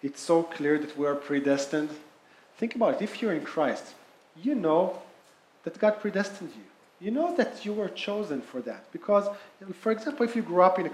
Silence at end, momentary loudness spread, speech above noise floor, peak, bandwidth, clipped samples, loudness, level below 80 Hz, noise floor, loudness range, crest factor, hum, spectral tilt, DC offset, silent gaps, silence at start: 0 s; 14 LU; 31 dB; -6 dBFS; 13 kHz; under 0.1%; -28 LUFS; -80 dBFS; -59 dBFS; 2 LU; 22 dB; none; -5.5 dB/octave; under 0.1%; none; 0.05 s